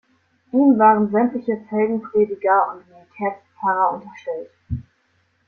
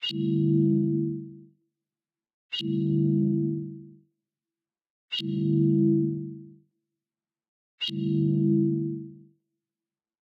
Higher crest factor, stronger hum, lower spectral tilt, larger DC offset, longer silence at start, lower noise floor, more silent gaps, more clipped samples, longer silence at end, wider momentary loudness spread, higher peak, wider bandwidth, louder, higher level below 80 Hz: about the same, 18 dB vs 16 dB; neither; first, -10 dB/octave vs -8.5 dB/octave; neither; first, 0.55 s vs 0 s; second, -64 dBFS vs under -90 dBFS; second, none vs 2.34-2.49 s, 4.90-5.08 s, 7.48-7.78 s; neither; second, 0.65 s vs 1.1 s; about the same, 17 LU vs 16 LU; first, -2 dBFS vs -12 dBFS; about the same, 5.8 kHz vs 6.2 kHz; first, -19 LUFS vs -26 LUFS; first, -52 dBFS vs -70 dBFS